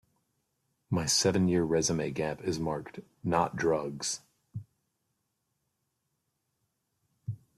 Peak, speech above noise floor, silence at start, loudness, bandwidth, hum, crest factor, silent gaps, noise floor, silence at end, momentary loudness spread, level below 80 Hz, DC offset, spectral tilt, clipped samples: -12 dBFS; 51 dB; 0.9 s; -30 LUFS; 14 kHz; none; 20 dB; none; -81 dBFS; 0.2 s; 20 LU; -62 dBFS; under 0.1%; -4 dB/octave; under 0.1%